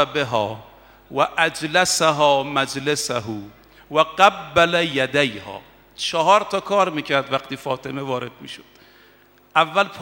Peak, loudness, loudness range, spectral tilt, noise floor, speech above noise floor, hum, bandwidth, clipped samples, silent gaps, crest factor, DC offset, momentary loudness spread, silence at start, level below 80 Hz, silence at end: 0 dBFS; -20 LUFS; 4 LU; -3 dB/octave; -53 dBFS; 33 dB; none; 17 kHz; under 0.1%; none; 22 dB; under 0.1%; 17 LU; 0 s; -58 dBFS; 0 s